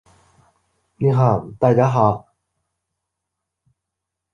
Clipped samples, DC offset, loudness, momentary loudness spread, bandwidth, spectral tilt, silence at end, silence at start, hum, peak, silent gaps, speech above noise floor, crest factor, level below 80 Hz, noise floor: under 0.1%; under 0.1%; -18 LUFS; 6 LU; 6.8 kHz; -9.5 dB/octave; 2.15 s; 1 s; none; -2 dBFS; none; 66 dB; 20 dB; -54 dBFS; -82 dBFS